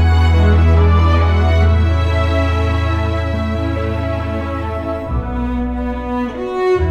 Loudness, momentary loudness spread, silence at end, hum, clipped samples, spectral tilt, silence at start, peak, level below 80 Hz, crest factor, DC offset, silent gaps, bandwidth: -16 LUFS; 9 LU; 0 s; none; under 0.1%; -8 dB/octave; 0 s; -2 dBFS; -20 dBFS; 12 dB; under 0.1%; none; 6.4 kHz